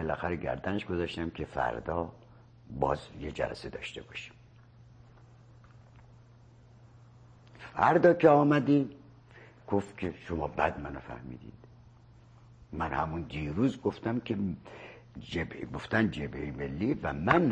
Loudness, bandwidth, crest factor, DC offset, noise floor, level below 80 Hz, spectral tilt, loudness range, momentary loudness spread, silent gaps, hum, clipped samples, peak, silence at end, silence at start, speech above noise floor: -31 LUFS; 9.4 kHz; 24 dB; under 0.1%; -56 dBFS; -52 dBFS; -7.5 dB/octave; 11 LU; 20 LU; none; none; under 0.1%; -8 dBFS; 0 s; 0 s; 26 dB